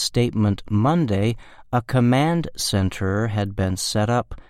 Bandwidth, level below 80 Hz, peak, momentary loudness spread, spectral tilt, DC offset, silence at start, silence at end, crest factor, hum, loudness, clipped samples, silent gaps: 15.5 kHz; -44 dBFS; -6 dBFS; 5 LU; -5.5 dB/octave; under 0.1%; 0 s; 0.1 s; 16 dB; none; -21 LUFS; under 0.1%; none